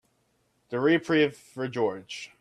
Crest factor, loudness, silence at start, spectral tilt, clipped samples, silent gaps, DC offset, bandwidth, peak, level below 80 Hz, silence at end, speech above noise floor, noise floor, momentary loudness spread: 16 dB; -27 LUFS; 0.7 s; -5.5 dB/octave; under 0.1%; none; under 0.1%; 12 kHz; -12 dBFS; -72 dBFS; 0.15 s; 44 dB; -71 dBFS; 14 LU